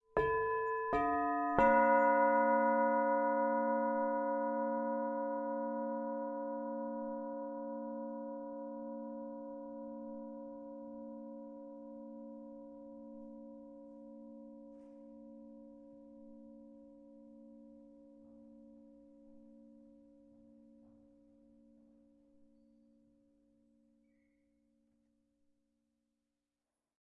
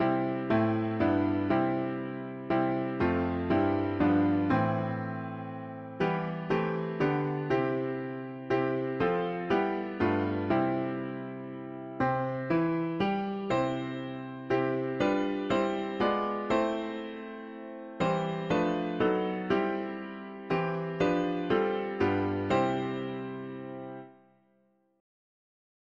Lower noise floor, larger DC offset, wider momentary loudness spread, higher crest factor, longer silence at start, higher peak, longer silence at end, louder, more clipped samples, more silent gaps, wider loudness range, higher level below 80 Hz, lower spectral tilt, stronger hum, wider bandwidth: first, under -90 dBFS vs -70 dBFS; neither; first, 26 LU vs 12 LU; first, 26 dB vs 16 dB; first, 0.15 s vs 0 s; about the same, -12 dBFS vs -14 dBFS; first, 7.4 s vs 1.85 s; second, -35 LUFS vs -30 LUFS; neither; neither; first, 26 LU vs 3 LU; second, -68 dBFS vs -60 dBFS; second, -5.5 dB/octave vs -8 dB/octave; neither; second, 4.2 kHz vs 7.4 kHz